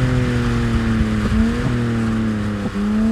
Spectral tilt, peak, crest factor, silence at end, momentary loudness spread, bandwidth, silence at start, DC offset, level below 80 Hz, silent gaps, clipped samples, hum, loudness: -7 dB/octave; -4 dBFS; 14 dB; 0 s; 3 LU; 11.5 kHz; 0 s; under 0.1%; -26 dBFS; none; under 0.1%; none; -19 LUFS